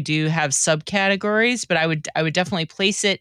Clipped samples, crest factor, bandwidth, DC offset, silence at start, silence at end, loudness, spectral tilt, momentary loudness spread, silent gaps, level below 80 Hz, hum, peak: under 0.1%; 16 dB; 13.5 kHz; under 0.1%; 0 s; 0.05 s; -20 LUFS; -3.5 dB/octave; 4 LU; none; -60 dBFS; none; -4 dBFS